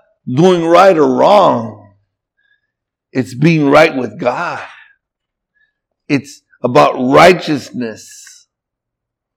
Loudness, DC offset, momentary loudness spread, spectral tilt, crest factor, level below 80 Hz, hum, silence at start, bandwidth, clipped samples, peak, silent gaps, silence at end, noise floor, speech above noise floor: -11 LUFS; under 0.1%; 16 LU; -6 dB/octave; 14 dB; -52 dBFS; none; 0.25 s; 17.5 kHz; 0.5%; 0 dBFS; none; 1.4 s; -79 dBFS; 68 dB